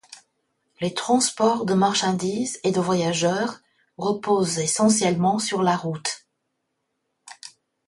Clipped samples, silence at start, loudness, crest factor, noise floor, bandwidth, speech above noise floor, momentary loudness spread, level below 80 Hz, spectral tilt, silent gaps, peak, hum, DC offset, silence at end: under 0.1%; 0.1 s; -22 LUFS; 18 dB; -76 dBFS; 11.5 kHz; 55 dB; 11 LU; -64 dBFS; -4 dB/octave; none; -6 dBFS; none; under 0.1%; 0.4 s